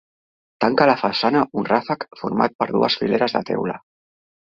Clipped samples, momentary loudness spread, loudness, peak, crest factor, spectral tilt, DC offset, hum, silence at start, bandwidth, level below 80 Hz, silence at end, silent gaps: under 0.1%; 9 LU; -20 LUFS; -2 dBFS; 20 dB; -6.5 dB/octave; under 0.1%; none; 0.6 s; 7.4 kHz; -60 dBFS; 0.75 s; 2.55-2.59 s